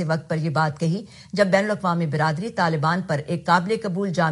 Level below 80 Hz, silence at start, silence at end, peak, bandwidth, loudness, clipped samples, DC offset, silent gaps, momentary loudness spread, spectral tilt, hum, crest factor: -60 dBFS; 0 s; 0 s; -4 dBFS; 11.5 kHz; -22 LUFS; under 0.1%; under 0.1%; none; 6 LU; -6.5 dB/octave; none; 18 dB